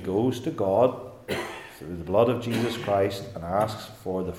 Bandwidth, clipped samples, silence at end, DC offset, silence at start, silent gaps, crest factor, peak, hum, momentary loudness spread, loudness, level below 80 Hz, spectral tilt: 17 kHz; under 0.1%; 0 s; under 0.1%; 0 s; none; 20 dB; -6 dBFS; none; 14 LU; -26 LUFS; -58 dBFS; -6.5 dB/octave